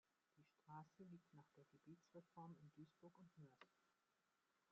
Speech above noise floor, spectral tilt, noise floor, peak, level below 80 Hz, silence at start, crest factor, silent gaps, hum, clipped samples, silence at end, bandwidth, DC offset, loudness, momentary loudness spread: 22 dB; -7 dB/octave; -88 dBFS; -48 dBFS; under -90 dBFS; 0.35 s; 18 dB; none; none; under 0.1%; 0 s; 7 kHz; under 0.1%; -66 LUFS; 6 LU